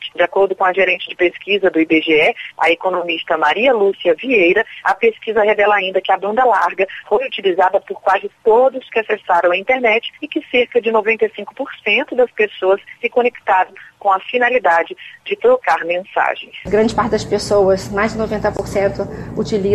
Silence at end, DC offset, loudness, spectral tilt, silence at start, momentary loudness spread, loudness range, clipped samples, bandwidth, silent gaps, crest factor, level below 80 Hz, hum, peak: 0 s; under 0.1%; -16 LUFS; -5 dB/octave; 0 s; 6 LU; 3 LU; under 0.1%; 12.5 kHz; none; 12 dB; -46 dBFS; none; -2 dBFS